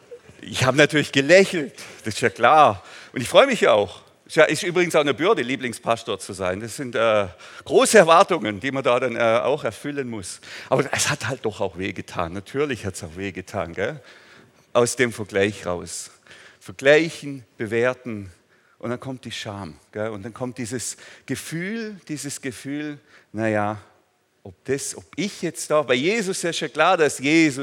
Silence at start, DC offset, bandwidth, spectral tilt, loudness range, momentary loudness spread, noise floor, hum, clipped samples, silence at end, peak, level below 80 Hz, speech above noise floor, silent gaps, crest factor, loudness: 0.1 s; under 0.1%; 17 kHz; -4 dB/octave; 11 LU; 17 LU; -63 dBFS; none; under 0.1%; 0 s; 0 dBFS; -66 dBFS; 42 dB; none; 22 dB; -21 LUFS